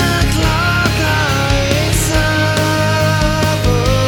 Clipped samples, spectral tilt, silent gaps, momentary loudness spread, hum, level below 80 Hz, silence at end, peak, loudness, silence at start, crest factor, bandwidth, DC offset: under 0.1%; -4.5 dB/octave; none; 1 LU; none; -22 dBFS; 0 s; 0 dBFS; -14 LUFS; 0 s; 12 dB; 19 kHz; under 0.1%